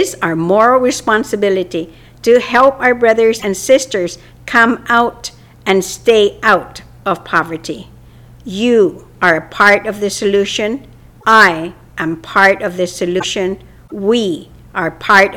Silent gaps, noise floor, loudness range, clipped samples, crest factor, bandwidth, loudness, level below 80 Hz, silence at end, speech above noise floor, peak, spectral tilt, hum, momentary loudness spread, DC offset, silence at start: none; -39 dBFS; 3 LU; under 0.1%; 14 dB; 17.5 kHz; -13 LUFS; -46 dBFS; 0 s; 26 dB; 0 dBFS; -4 dB/octave; none; 15 LU; under 0.1%; 0 s